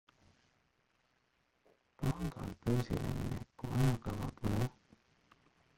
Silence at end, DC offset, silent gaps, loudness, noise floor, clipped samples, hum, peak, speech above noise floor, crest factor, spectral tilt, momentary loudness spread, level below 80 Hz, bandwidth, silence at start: 1.1 s; under 0.1%; none; -38 LUFS; -77 dBFS; under 0.1%; none; -20 dBFS; 40 dB; 18 dB; -7 dB/octave; 8 LU; -52 dBFS; 16.5 kHz; 2 s